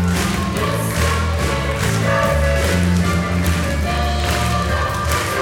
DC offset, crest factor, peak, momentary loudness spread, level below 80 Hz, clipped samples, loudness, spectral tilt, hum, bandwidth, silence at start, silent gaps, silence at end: under 0.1%; 14 dB; -4 dBFS; 3 LU; -24 dBFS; under 0.1%; -18 LUFS; -5 dB/octave; none; 17.5 kHz; 0 s; none; 0 s